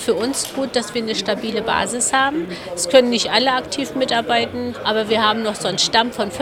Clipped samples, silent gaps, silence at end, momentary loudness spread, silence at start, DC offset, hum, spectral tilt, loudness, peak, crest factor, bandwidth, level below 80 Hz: under 0.1%; none; 0 s; 7 LU; 0 s; under 0.1%; none; -2.5 dB/octave; -18 LUFS; 0 dBFS; 18 dB; 16.5 kHz; -52 dBFS